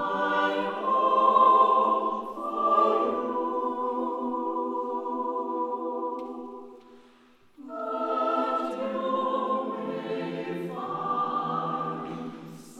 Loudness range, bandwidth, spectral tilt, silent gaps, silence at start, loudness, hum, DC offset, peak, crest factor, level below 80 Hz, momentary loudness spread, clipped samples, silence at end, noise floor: 9 LU; 10.5 kHz; -6.5 dB/octave; none; 0 s; -27 LUFS; none; under 0.1%; -8 dBFS; 20 dB; -72 dBFS; 13 LU; under 0.1%; 0 s; -58 dBFS